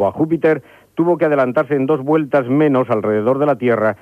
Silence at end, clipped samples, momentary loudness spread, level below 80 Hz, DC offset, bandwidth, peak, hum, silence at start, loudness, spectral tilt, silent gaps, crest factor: 0.05 s; under 0.1%; 3 LU; -60 dBFS; under 0.1%; 5.4 kHz; -4 dBFS; none; 0 s; -16 LUFS; -9 dB/octave; none; 12 dB